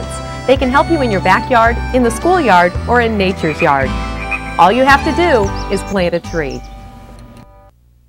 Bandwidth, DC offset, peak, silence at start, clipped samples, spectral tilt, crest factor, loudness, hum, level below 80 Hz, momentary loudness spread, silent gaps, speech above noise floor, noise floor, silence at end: 16.5 kHz; under 0.1%; 0 dBFS; 0 s; 0.1%; -5.5 dB/octave; 14 dB; -13 LUFS; none; -28 dBFS; 10 LU; none; 33 dB; -45 dBFS; 0.65 s